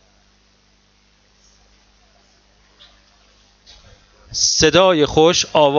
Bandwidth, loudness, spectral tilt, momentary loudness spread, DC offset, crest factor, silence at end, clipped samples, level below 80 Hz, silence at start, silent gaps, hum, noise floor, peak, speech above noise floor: 7.6 kHz; -14 LUFS; -3 dB/octave; 5 LU; under 0.1%; 20 dB; 0 s; under 0.1%; -46 dBFS; 4.3 s; none; 50 Hz at -55 dBFS; -57 dBFS; 0 dBFS; 43 dB